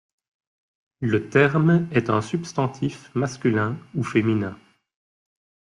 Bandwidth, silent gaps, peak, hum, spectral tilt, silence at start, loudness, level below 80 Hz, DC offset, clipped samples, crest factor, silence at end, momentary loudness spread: 11 kHz; none; -4 dBFS; none; -7 dB/octave; 1 s; -23 LUFS; -60 dBFS; under 0.1%; under 0.1%; 20 dB; 1.15 s; 9 LU